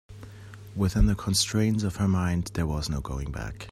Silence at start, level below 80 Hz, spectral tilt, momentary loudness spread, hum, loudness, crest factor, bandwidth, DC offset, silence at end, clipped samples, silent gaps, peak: 0.1 s; -34 dBFS; -5 dB/octave; 19 LU; none; -27 LUFS; 16 dB; 15 kHz; under 0.1%; 0 s; under 0.1%; none; -10 dBFS